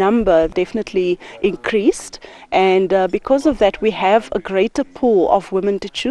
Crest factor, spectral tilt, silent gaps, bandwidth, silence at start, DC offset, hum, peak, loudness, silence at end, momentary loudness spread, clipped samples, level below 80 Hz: 16 dB; -5.5 dB/octave; none; 11.5 kHz; 0 s; under 0.1%; none; 0 dBFS; -17 LUFS; 0 s; 7 LU; under 0.1%; -42 dBFS